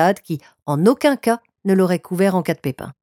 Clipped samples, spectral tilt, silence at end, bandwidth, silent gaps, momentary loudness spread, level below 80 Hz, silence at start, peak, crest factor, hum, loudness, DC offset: under 0.1%; -6.5 dB/octave; 0.1 s; 17 kHz; 0.62-0.66 s; 11 LU; -62 dBFS; 0 s; -2 dBFS; 16 dB; none; -19 LUFS; under 0.1%